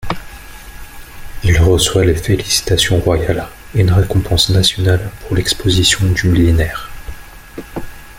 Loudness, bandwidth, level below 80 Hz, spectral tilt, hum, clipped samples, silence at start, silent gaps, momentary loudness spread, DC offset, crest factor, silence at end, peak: -13 LUFS; 16.5 kHz; -28 dBFS; -4.5 dB/octave; none; under 0.1%; 0 s; none; 22 LU; under 0.1%; 14 dB; 0 s; 0 dBFS